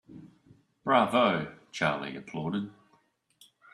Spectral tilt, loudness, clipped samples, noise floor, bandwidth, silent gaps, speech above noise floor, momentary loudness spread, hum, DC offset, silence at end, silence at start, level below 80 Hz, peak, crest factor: -5.5 dB/octave; -29 LUFS; under 0.1%; -69 dBFS; 13 kHz; none; 41 dB; 14 LU; none; under 0.1%; 1.05 s; 0.1 s; -70 dBFS; -8 dBFS; 24 dB